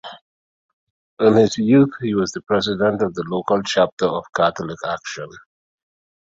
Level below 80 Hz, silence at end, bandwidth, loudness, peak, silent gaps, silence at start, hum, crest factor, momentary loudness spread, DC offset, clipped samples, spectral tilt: -56 dBFS; 1 s; 7.8 kHz; -19 LUFS; -2 dBFS; 0.21-1.17 s, 3.92-3.97 s; 0.05 s; none; 18 dB; 13 LU; under 0.1%; under 0.1%; -5.5 dB/octave